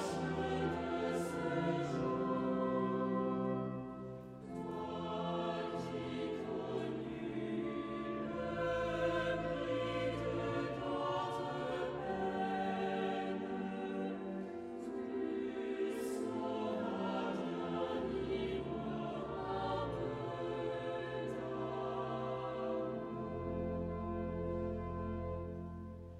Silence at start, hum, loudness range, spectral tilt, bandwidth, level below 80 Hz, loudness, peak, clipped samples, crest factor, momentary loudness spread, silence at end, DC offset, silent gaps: 0 s; none; 3 LU; -7 dB/octave; 13.5 kHz; -60 dBFS; -40 LUFS; -24 dBFS; under 0.1%; 16 dB; 6 LU; 0 s; under 0.1%; none